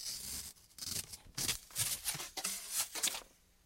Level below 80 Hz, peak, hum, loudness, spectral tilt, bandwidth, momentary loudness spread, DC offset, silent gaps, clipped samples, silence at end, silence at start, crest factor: -64 dBFS; -18 dBFS; none; -38 LUFS; 0 dB/octave; 16.5 kHz; 10 LU; under 0.1%; none; under 0.1%; 0.35 s; 0 s; 22 dB